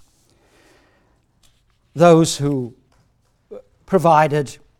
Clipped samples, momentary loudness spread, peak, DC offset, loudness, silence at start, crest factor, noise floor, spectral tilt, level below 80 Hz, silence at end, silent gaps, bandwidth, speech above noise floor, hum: under 0.1%; 15 LU; 0 dBFS; under 0.1%; -16 LUFS; 1.95 s; 20 dB; -61 dBFS; -6 dB/octave; -56 dBFS; 0.25 s; none; 16 kHz; 46 dB; none